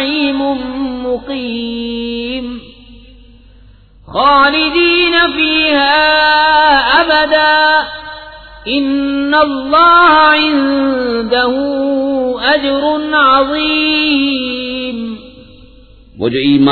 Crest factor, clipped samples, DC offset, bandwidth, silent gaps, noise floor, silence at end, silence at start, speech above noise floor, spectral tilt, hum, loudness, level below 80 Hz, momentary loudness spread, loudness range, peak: 12 dB; under 0.1%; under 0.1%; 4.6 kHz; none; -41 dBFS; 0 s; 0 s; 30 dB; -6.5 dB/octave; none; -11 LUFS; -40 dBFS; 12 LU; 9 LU; 0 dBFS